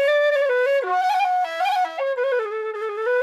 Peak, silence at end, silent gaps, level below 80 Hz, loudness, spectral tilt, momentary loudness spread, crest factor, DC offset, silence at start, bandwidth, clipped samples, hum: -10 dBFS; 0 s; none; -80 dBFS; -21 LUFS; 0 dB/octave; 7 LU; 10 dB; under 0.1%; 0 s; 14 kHz; under 0.1%; none